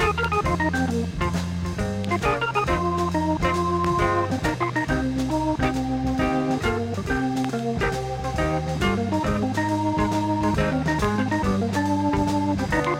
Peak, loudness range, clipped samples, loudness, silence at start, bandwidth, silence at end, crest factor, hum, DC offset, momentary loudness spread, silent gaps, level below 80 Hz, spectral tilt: -8 dBFS; 2 LU; under 0.1%; -24 LUFS; 0 s; 16.5 kHz; 0 s; 16 dB; none; under 0.1%; 3 LU; none; -36 dBFS; -6 dB/octave